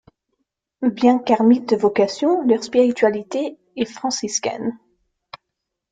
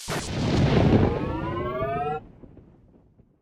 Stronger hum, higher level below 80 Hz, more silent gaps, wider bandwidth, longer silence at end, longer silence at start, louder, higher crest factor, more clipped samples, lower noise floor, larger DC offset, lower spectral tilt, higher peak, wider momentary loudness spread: neither; second, -64 dBFS vs -38 dBFS; neither; second, 9.2 kHz vs 14.5 kHz; first, 1.15 s vs 0.8 s; first, 0.8 s vs 0 s; first, -19 LUFS vs -25 LUFS; about the same, 18 dB vs 16 dB; neither; first, -80 dBFS vs -57 dBFS; neither; second, -4 dB/octave vs -6.5 dB/octave; first, -2 dBFS vs -8 dBFS; about the same, 11 LU vs 10 LU